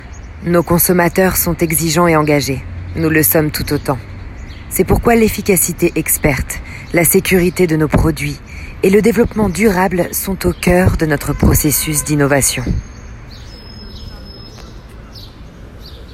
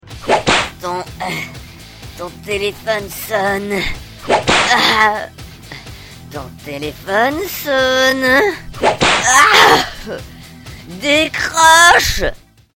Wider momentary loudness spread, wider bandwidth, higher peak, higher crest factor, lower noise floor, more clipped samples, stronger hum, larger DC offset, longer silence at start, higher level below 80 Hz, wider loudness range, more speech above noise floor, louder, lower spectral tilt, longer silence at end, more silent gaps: about the same, 22 LU vs 22 LU; about the same, 16.5 kHz vs 18 kHz; about the same, 0 dBFS vs 0 dBFS; about the same, 14 dB vs 16 dB; about the same, -34 dBFS vs -35 dBFS; neither; neither; neither; about the same, 0 s vs 0.05 s; first, -28 dBFS vs -36 dBFS; second, 5 LU vs 9 LU; about the same, 21 dB vs 20 dB; about the same, -13 LUFS vs -13 LUFS; first, -5 dB/octave vs -2 dB/octave; second, 0 s vs 0.4 s; neither